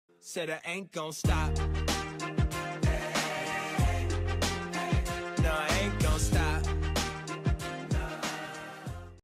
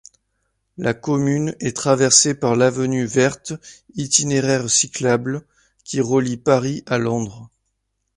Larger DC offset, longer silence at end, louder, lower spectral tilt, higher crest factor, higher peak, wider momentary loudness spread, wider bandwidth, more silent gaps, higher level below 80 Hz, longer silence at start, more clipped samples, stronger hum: neither; second, 0.05 s vs 0.7 s; second, -32 LUFS vs -18 LUFS; about the same, -4.5 dB/octave vs -4 dB/octave; second, 14 dB vs 20 dB; second, -18 dBFS vs 0 dBFS; second, 8 LU vs 15 LU; first, 16 kHz vs 11.5 kHz; neither; first, -36 dBFS vs -56 dBFS; second, 0.25 s vs 0.8 s; neither; neither